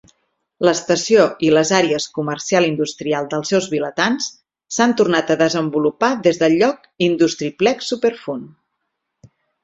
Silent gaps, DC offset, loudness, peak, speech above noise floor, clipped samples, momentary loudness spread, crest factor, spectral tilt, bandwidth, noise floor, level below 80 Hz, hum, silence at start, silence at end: none; under 0.1%; -17 LUFS; 0 dBFS; 58 dB; under 0.1%; 8 LU; 18 dB; -4 dB/octave; 8 kHz; -75 dBFS; -60 dBFS; none; 0.6 s; 1.15 s